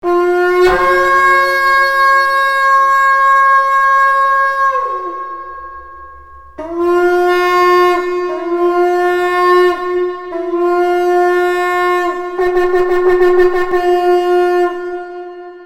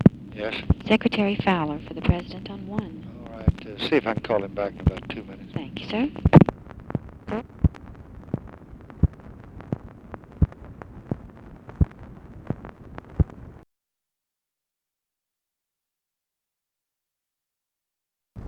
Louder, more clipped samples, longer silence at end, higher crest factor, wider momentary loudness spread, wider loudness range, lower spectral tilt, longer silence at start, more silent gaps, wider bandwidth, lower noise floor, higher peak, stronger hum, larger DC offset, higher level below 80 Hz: first, -12 LUFS vs -26 LUFS; neither; about the same, 0 s vs 0 s; second, 12 dB vs 26 dB; second, 13 LU vs 22 LU; second, 5 LU vs 11 LU; second, -4 dB/octave vs -9 dB/octave; about the same, 0.05 s vs 0 s; neither; first, 15 kHz vs 7.2 kHz; second, -36 dBFS vs -87 dBFS; about the same, 0 dBFS vs 0 dBFS; neither; first, 0.7% vs under 0.1%; second, -42 dBFS vs -36 dBFS